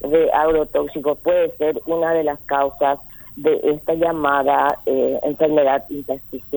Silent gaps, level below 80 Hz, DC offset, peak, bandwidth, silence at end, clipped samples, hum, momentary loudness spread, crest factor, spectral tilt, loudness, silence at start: none; -48 dBFS; under 0.1%; -2 dBFS; over 20 kHz; 0 s; under 0.1%; none; 7 LU; 16 dB; -7 dB/octave; -19 LUFS; 0 s